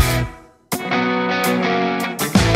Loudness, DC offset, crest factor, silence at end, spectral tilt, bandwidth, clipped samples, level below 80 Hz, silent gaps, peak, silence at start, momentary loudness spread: -19 LUFS; under 0.1%; 18 dB; 0 s; -4.5 dB/octave; 16.5 kHz; under 0.1%; -34 dBFS; none; -2 dBFS; 0 s; 8 LU